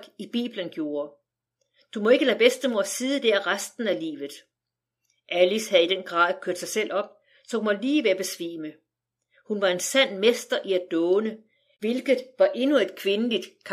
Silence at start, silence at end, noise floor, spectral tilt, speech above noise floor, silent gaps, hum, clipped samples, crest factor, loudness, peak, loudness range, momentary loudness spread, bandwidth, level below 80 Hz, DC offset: 0 s; 0 s; -86 dBFS; -3 dB/octave; 62 dB; none; none; under 0.1%; 20 dB; -24 LUFS; -6 dBFS; 2 LU; 13 LU; 15.5 kHz; -88 dBFS; under 0.1%